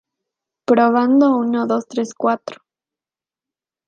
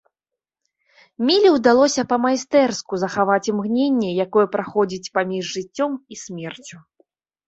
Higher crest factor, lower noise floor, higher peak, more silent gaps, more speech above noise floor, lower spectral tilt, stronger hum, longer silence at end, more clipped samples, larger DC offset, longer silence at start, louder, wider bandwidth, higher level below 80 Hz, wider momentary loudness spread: about the same, 16 dB vs 18 dB; about the same, under -90 dBFS vs -87 dBFS; about the same, -2 dBFS vs -2 dBFS; neither; first, over 74 dB vs 67 dB; first, -6 dB/octave vs -4.5 dB/octave; neither; first, 1.35 s vs 0.7 s; neither; neither; second, 0.7 s vs 1.2 s; about the same, -17 LUFS vs -19 LUFS; second, 7.4 kHz vs 8.2 kHz; second, -70 dBFS vs -64 dBFS; second, 11 LU vs 17 LU